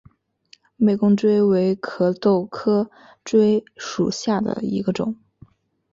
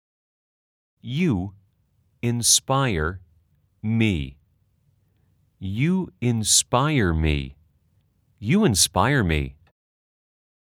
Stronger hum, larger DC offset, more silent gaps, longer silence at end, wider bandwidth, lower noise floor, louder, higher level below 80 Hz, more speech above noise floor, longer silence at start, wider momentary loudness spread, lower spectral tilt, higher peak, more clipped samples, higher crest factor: neither; neither; neither; second, 0.8 s vs 1.2 s; second, 7.6 kHz vs 19 kHz; second, -55 dBFS vs -65 dBFS; about the same, -20 LUFS vs -21 LUFS; second, -60 dBFS vs -42 dBFS; second, 36 dB vs 44 dB; second, 0.8 s vs 1.05 s; second, 10 LU vs 17 LU; first, -7 dB/octave vs -4 dB/octave; about the same, -6 dBFS vs -4 dBFS; neither; about the same, 16 dB vs 20 dB